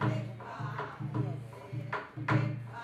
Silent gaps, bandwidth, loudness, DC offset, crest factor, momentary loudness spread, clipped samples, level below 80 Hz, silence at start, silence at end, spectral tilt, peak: none; 8 kHz; -36 LUFS; under 0.1%; 18 dB; 11 LU; under 0.1%; -66 dBFS; 0 s; 0 s; -8 dB/octave; -18 dBFS